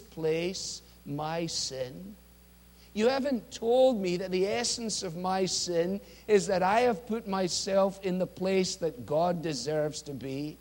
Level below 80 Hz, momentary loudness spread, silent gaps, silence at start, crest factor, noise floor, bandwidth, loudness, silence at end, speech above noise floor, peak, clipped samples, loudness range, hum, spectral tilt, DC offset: -60 dBFS; 12 LU; none; 0 s; 18 dB; -56 dBFS; 16.5 kHz; -30 LUFS; 0.05 s; 27 dB; -12 dBFS; under 0.1%; 4 LU; none; -4 dB/octave; under 0.1%